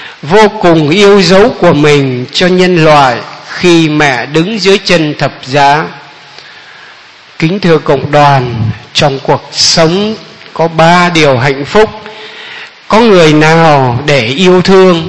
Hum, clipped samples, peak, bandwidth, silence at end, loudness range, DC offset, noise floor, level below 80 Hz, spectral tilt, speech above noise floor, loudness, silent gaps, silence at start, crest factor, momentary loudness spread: none; 5%; 0 dBFS; 11 kHz; 0 s; 5 LU; 2%; -34 dBFS; -36 dBFS; -5 dB/octave; 28 dB; -7 LUFS; none; 0 s; 8 dB; 11 LU